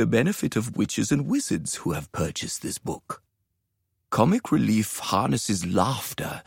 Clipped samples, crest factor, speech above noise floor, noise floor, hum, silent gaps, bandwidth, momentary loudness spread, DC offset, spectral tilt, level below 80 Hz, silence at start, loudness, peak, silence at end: under 0.1%; 22 dB; 52 dB; -77 dBFS; none; none; 16.5 kHz; 9 LU; under 0.1%; -5 dB/octave; -54 dBFS; 0 s; -25 LUFS; -4 dBFS; 0.05 s